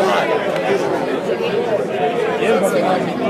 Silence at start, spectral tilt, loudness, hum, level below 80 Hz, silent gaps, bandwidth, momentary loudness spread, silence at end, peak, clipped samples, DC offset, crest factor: 0 s; -5 dB/octave; -18 LUFS; none; -58 dBFS; none; 15.5 kHz; 4 LU; 0 s; -4 dBFS; under 0.1%; under 0.1%; 14 dB